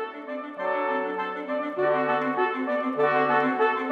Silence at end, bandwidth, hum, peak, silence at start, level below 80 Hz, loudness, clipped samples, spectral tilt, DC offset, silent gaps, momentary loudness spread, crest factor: 0 s; 6.6 kHz; none; -10 dBFS; 0 s; -80 dBFS; -26 LUFS; under 0.1%; -7 dB/octave; under 0.1%; none; 9 LU; 16 dB